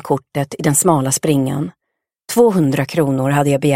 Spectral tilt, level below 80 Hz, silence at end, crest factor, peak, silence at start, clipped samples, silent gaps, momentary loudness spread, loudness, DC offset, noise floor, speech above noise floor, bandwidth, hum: -5.5 dB/octave; -56 dBFS; 0 s; 16 dB; 0 dBFS; 0.05 s; under 0.1%; none; 8 LU; -16 LUFS; 0.2%; -44 dBFS; 29 dB; 16.5 kHz; none